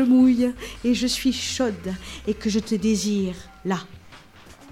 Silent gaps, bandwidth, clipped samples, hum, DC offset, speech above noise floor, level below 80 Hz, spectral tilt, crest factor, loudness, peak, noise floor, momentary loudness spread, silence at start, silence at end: none; 14.5 kHz; under 0.1%; none; under 0.1%; 25 dB; -46 dBFS; -4.5 dB/octave; 14 dB; -23 LUFS; -8 dBFS; -47 dBFS; 13 LU; 0 s; 0 s